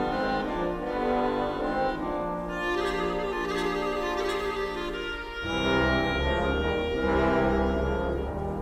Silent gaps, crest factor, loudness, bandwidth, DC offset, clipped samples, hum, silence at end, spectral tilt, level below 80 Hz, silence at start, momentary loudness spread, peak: none; 16 dB; -28 LUFS; 14.5 kHz; under 0.1%; under 0.1%; none; 0 s; -6 dB/octave; -38 dBFS; 0 s; 7 LU; -12 dBFS